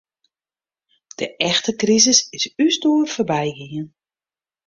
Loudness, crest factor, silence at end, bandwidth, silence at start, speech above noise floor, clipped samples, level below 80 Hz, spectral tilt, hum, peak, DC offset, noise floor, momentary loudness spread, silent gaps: -17 LUFS; 20 dB; 0.8 s; 7.6 kHz; 1.2 s; over 71 dB; under 0.1%; -62 dBFS; -2.5 dB/octave; none; -2 dBFS; under 0.1%; under -90 dBFS; 18 LU; none